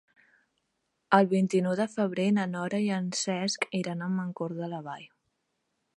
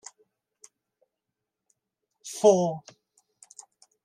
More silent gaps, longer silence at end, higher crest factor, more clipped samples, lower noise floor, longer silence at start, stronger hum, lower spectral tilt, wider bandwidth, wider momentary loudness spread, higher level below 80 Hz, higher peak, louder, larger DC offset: neither; second, 0.9 s vs 1.25 s; about the same, 24 dB vs 24 dB; neither; second, -79 dBFS vs -86 dBFS; second, 1.1 s vs 2.25 s; neither; about the same, -5.5 dB/octave vs -5.5 dB/octave; second, 11 kHz vs 13.5 kHz; second, 12 LU vs 27 LU; first, -78 dBFS vs -84 dBFS; about the same, -6 dBFS vs -6 dBFS; second, -29 LUFS vs -23 LUFS; neither